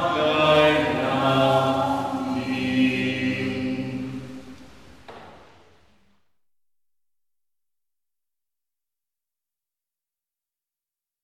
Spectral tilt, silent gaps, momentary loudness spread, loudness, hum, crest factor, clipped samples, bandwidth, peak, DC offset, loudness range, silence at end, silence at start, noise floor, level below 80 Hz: -6 dB/octave; none; 14 LU; -22 LUFS; none; 20 dB; under 0.1%; 14 kHz; -6 dBFS; under 0.1%; 16 LU; 5.85 s; 0 s; under -90 dBFS; -56 dBFS